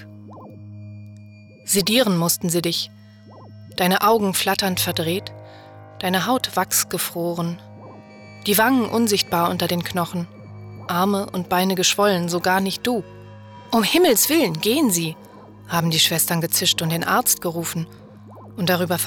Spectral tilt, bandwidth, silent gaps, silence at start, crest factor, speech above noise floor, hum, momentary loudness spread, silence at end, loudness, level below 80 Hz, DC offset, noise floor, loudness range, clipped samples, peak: -3.5 dB/octave; over 20 kHz; none; 0 s; 14 dB; 24 dB; none; 19 LU; 0 s; -20 LUFS; -58 dBFS; under 0.1%; -44 dBFS; 4 LU; under 0.1%; -6 dBFS